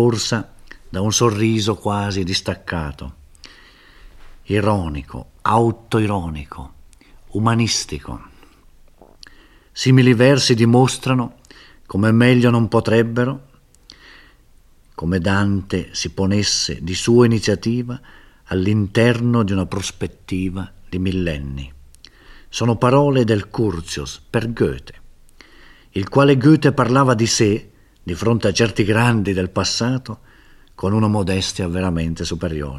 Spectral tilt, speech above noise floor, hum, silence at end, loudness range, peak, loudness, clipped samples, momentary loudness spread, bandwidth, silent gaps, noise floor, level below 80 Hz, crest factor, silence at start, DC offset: -5.5 dB/octave; 32 dB; none; 0 s; 7 LU; 0 dBFS; -18 LUFS; under 0.1%; 16 LU; 13 kHz; none; -50 dBFS; -42 dBFS; 18 dB; 0 s; under 0.1%